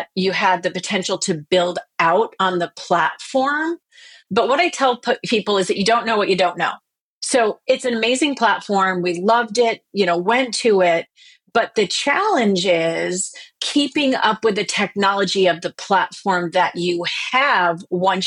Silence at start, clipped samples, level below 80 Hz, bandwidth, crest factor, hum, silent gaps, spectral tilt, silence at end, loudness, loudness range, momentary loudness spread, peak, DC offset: 0 s; under 0.1%; -66 dBFS; 11.5 kHz; 18 dB; none; 7.01-7.21 s; -3.5 dB/octave; 0 s; -18 LUFS; 2 LU; 6 LU; -2 dBFS; under 0.1%